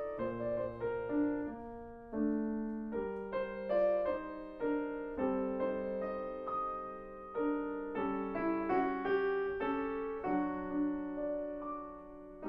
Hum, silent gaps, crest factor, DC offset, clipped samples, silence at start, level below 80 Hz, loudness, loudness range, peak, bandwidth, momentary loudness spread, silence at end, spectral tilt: none; none; 16 dB; under 0.1%; under 0.1%; 0 s; -60 dBFS; -37 LUFS; 2 LU; -22 dBFS; 5.4 kHz; 10 LU; 0 s; -9.5 dB/octave